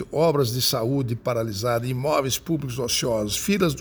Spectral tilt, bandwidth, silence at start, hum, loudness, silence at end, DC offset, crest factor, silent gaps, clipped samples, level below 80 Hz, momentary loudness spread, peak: -4.5 dB/octave; over 20 kHz; 0 s; none; -23 LUFS; 0 s; under 0.1%; 16 dB; none; under 0.1%; -48 dBFS; 5 LU; -8 dBFS